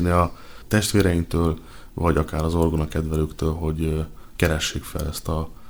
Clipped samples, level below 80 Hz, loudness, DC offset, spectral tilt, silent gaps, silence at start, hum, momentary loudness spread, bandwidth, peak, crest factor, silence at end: under 0.1%; -32 dBFS; -24 LUFS; under 0.1%; -5.5 dB/octave; none; 0 s; none; 9 LU; over 20 kHz; -2 dBFS; 20 dB; 0 s